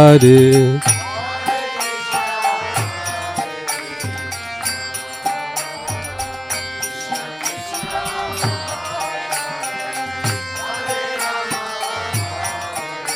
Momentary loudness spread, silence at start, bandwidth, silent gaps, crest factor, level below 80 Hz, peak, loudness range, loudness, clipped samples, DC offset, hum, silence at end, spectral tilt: 10 LU; 0 s; 16.5 kHz; none; 18 dB; -52 dBFS; 0 dBFS; 5 LU; -19 LUFS; under 0.1%; under 0.1%; none; 0 s; -4.5 dB/octave